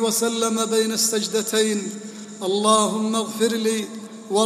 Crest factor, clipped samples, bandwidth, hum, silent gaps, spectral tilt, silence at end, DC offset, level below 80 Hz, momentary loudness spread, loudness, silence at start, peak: 18 dB; under 0.1%; 15.5 kHz; none; none; -3 dB/octave; 0 s; under 0.1%; -72 dBFS; 14 LU; -21 LUFS; 0 s; -4 dBFS